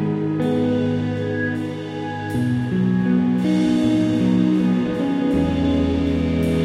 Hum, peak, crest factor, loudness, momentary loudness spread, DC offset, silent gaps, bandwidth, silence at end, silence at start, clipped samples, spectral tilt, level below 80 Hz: none; -6 dBFS; 12 dB; -20 LUFS; 6 LU; under 0.1%; none; 12 kHz; 0 s; 0 s; under 0.1%; -8 dB/octave; -42 dBFS